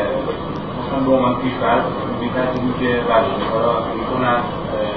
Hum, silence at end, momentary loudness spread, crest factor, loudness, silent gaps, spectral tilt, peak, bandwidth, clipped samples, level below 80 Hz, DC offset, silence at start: none; 0 s; 7 LU; 16 dB; -19 LUFS; none; -9 dB/octave; -2 dBFS; 5.8 kHz; under 0.1%; -40 dBFS; 0.6%; 0 s